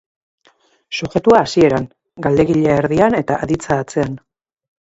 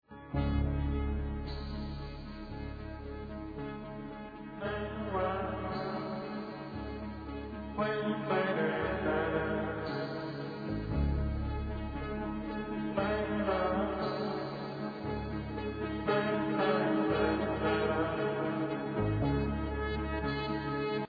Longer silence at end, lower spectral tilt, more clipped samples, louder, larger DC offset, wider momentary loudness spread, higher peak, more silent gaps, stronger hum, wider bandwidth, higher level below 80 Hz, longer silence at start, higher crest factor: first, 0.7 s vs 0 s; about the same, -6.5 dB/octave vs -5.5 dB/octave; neither; first, -16 LUFS vs -35 LUFS; neither; about the same, 12 LU vs 11 LU; first, 0 dBFS vs -18 dBFS; neither; neither; first, 8.2 kHz vs 5 kHz; about the same, -44 dBFS vs -42 dBFS; first, 0.9 s vs 0.1 s; about the same, 16 dB vs 16 dB